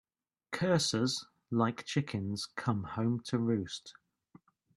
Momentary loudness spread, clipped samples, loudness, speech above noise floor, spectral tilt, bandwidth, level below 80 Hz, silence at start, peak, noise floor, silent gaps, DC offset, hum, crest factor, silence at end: 11 LU; under 0.1%; -34 LUFS; 30 dB; -5 dB/octave; 12.5 kHz; -70 dBFS; 0.5 s; -14 dBFS; -63 dBFS; none; under 0.1%; none; 20 dB; 0.85 s